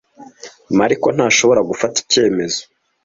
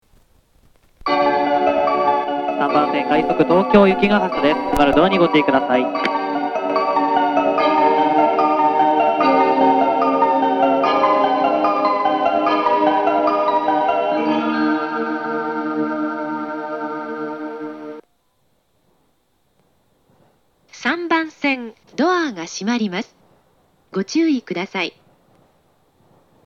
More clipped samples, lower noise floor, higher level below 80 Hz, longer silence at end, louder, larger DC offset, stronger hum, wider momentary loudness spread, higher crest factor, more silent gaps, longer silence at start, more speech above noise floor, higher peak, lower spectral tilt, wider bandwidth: neither; second, -38 dBFS vs -65 dBFS; second, -54 dBFS vs -48 dBFS; second, 0.4 s vs 1.55 s; first, -15 LUFS vs -18 LUFS; neither; neither; second, 8 LU vs 11 LU; about the same, 16 dB vs 18 dB; neither; second, 0.2 s vs 1.05 s; second, 24 dB vs 49 dB; about the same, 0 dBFS vs 0 dBFS; second, -3 dB/octave vs -5.5 dB/octave; second, 7.8 kHz vs 9.8 kHz